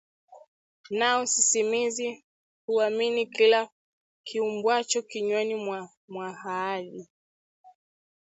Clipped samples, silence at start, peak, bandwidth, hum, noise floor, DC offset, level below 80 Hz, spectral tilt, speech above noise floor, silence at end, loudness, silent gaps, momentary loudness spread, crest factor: under 0.1%; 0.3 s; -8 dBFS; 8.2 kHz; none; under -90 dBFS; under 0.1%; -78 dBFS; -1.5 dB/octave; over 64 dB; 0.65 s; -26 LUFS; 0.48-0.84 s, 2.24-2.68 s, 3.72-4.24 s, 5.97-6.08 s, 7.10-7.64 s; 18 LU; 20 dB